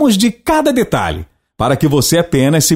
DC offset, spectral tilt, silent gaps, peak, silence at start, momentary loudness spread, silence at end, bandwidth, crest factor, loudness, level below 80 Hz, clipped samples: under 0.1%; -4.5 dB/octave; none; 0 dBFS; 0 s; 7 LU; 0 s; 16.5 kHz; 12 dB; -13 LUFS; -36 dBFS; under 0.1%